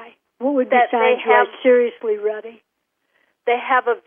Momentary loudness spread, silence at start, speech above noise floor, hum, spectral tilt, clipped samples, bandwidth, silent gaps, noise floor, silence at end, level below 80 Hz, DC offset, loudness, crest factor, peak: 11 LU; 0 s; 53 dB; none; -7 dB/octave; under 0.1%; 3.6 kHz; none; -71 dBFS; 0.1 s; -84 dBFS; under 0.1%; -18 LUFS; 16 dB; -2 dBFS